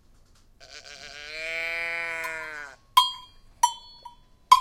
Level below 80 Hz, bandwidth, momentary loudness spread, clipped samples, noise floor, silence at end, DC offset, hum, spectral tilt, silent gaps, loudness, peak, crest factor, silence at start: -58 dBFS; 16.5 kHz; 22 LU; under 0.1%; -56 dBFS; 0 s; under 0.1%; none; 1 dB/octave; none; -26 LUFS; -2 dBFS; 26 dB; 0.6 s